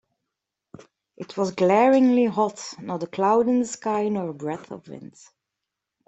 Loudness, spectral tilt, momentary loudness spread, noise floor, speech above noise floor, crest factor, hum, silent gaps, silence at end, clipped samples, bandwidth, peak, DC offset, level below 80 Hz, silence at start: -22 LUFS; -6 dB/octave; 22 LU; -84 dBFS; 62 dB; 18 dB; none; none; 1 s; under 0.1%; 8.2 kHz; -6 dBFS; under 0.1%; -70 dBFS; 1.2 s